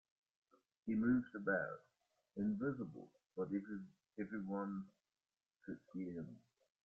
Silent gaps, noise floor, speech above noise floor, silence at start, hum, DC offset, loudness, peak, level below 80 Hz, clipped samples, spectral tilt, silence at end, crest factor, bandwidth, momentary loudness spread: none; under -90 dBFS; over 48 dB; 0.85 s; none; under 0.1%; -43 LUFS; -26 dBFS; -76 dBFS; under 0.1%; -9 dB/octave; 0.45 s; 18 dB; 3.3 kHz; 18 LU